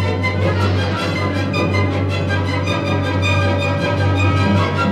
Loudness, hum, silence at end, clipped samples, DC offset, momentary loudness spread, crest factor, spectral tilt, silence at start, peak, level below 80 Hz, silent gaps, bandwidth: -17 LUFS; none; 0 s; under 0.1%; under 0.1%; 3 LU; 12 dB; -6.5 dB/octave; 0 s; -4 dBFS; -50 dBFS; none; 9.8 kHz